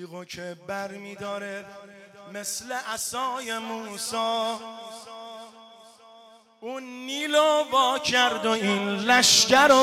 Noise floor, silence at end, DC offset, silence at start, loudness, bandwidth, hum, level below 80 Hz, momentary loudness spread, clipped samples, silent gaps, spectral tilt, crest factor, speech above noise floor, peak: -53 dBFS; 0 s; under 0.1%; 0 s; -23 LUFS; 17 kHz; none; -66 dBFS; 24 LU; under 0.1%; none; -1.5 dB/octave; 18 dB; 28 dB; -8 dBFS